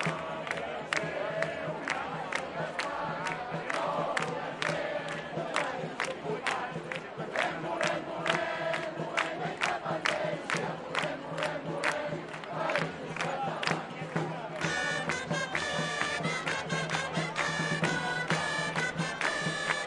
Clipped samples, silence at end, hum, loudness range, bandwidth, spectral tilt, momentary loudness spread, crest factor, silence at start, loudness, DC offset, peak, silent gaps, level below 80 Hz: under 0.1%; 0 s; none; 3 LU; 11.5 kHz; -4 dB/octave; 5 LU; 24 dB; 0 s; -32 LUFS; under 0.1%; -8 dBFS; none; -68 dBFS